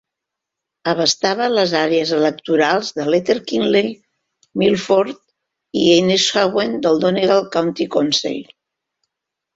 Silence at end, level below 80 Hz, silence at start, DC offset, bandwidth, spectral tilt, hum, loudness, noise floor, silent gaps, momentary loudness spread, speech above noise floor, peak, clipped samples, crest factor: 1.15 s; -60 dBFS; 0.85 s; under 0.1%; 8 kHz; -4 dB/octave; none; -17 LUFS; -82 dBFS; none; 10 LU; 66 dB; -2 dBFS; under 0.1%; 16 dB